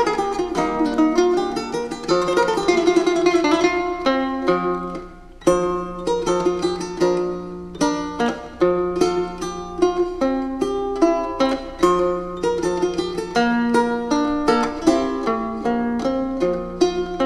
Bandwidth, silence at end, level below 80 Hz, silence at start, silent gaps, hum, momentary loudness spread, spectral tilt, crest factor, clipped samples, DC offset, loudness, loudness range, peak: 12 kHz; 0 s; -42 dBFS; 0 s; none; none; 7 LU; -5 dB/octave; 16 dB; under 0.1%; under 0.1%; -20 LUFS; 3 LU; -4 dBFS